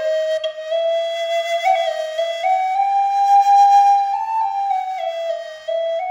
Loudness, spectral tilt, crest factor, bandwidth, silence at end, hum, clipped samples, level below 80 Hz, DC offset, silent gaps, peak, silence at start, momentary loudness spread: -18 LUFS; 1.5 dB/octave; 12 dB; 15.5 kHz; 0 s; none; under 0.1%; -74 dBFS; under 0.1%; none; -6 dBFS; 0 s; 12 LU